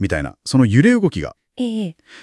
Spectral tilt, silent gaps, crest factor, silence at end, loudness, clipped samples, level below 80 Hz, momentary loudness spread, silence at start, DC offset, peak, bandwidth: -6.5 dB/octave; none; 16 dB; 0 s; -17 LUFS; under 0.1%; -42 dBFS; 16 LU; 0 s; under 0.1%; -2 dBFS; 12 kHz